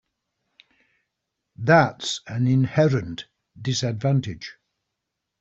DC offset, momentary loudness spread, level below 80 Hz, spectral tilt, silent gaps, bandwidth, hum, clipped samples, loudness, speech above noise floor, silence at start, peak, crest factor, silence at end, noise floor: under 0.1%; 19 LU; -58 dBFS; -6 dB/octave; none; 8 kHz; none; under 0.1%; -22 LUFS; 60 dB; 1.6 s; -2 dBFS; 22 dB; 0.9 s; -82 dBFS